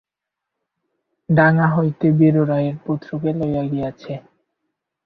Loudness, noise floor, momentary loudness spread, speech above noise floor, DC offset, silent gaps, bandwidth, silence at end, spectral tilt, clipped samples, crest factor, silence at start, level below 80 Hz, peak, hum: -18 LUFS; -83 dBFS; 13 LU; 66 dB; under 0.1%; none; 4.9 kHz; 0.85 s; -11 dB/octave; under 0.1%; 18 dB; 1.3 s; -54 dBFS; -2 dBFS; none